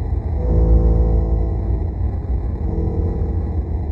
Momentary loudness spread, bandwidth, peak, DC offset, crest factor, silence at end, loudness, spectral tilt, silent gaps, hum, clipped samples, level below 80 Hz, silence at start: 7 LU; 2.2 kHz; -4 dBFS; under 0.1%; 14 dB; 0 s; -20 LUFS; -12 dB/octave; none; none; under 0.1%; -18 dBFS; 0 s